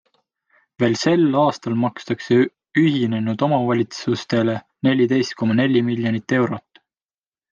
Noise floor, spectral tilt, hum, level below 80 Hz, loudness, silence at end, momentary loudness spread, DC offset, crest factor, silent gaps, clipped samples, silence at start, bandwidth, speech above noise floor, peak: under -90 dBFS; -6.5 dB/octave; none; -64 dBFS; -20 LUFS; 0.9 s; 6 LU; under 0.1%; 14 dB; none; under 0.1%; 0.8 s; 7.6 kHz; over 71 dB; -6 dBFS